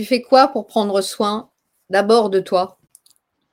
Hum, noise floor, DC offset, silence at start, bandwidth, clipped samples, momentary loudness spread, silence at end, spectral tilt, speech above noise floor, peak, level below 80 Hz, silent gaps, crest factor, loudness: none; -60 dBFS; under 0.1%; 0 s; 16.5 kHz; under 0.1%; 8 LU; 0.85 s; -4.5 dB/octave; 43 dB; 0 dBFS; -68 dBFS; none; 18 dB; -17 LUFS